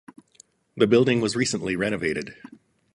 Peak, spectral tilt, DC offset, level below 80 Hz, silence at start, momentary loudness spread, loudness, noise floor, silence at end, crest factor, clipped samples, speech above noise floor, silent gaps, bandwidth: -6 dBFS; -5 dB/octave; under 0.1%; -58 dBFS; 0.75 s; 14 LU; -23 LUFS; -57 dBFS; 0.6 s; 20 dB; under 0.1%; 34 dB; none; 11.5 kHz